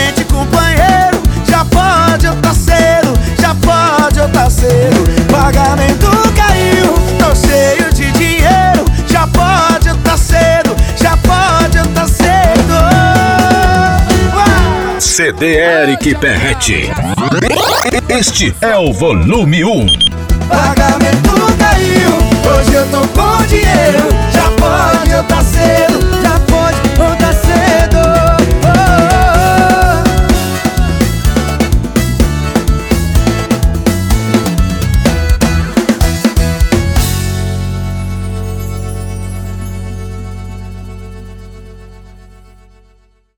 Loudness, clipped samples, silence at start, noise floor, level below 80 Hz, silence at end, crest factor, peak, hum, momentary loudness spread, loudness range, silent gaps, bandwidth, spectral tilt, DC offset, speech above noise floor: -9 LUFS; under 0.1%; 0 s; -49 dBFS; -16 dBFS; 1.45 s; 10 dB; 0 dBFS; none; 7 LU; 6 LU; none; 19.5 kHz; -5 dB/octave; under 0.1%; 40 dB